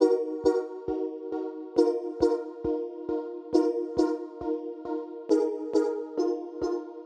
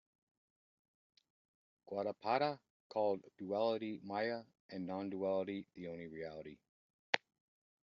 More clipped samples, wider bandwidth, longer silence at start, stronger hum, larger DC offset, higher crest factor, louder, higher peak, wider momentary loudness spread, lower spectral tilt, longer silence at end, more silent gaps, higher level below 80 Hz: neither; first, 9 kHz vs 7.2 kHz; second, 0 s vs 1.85 s; neither; neither; second, 20 dB vs 32 dB; first, -29 LUFS vs -41 LUFS; first, -8 dBFS vs -12 dBFS; second, 8 LU vs 12 LU; first, -6.5 dB/octave vs -3.5 dB/octave; second, 0 s vs 0.7 s; second, none vs 2.70-2.90 s, 4.60-4.69 s, 6.69-7.13 s; first, -58 dBFS vs -84 dBFS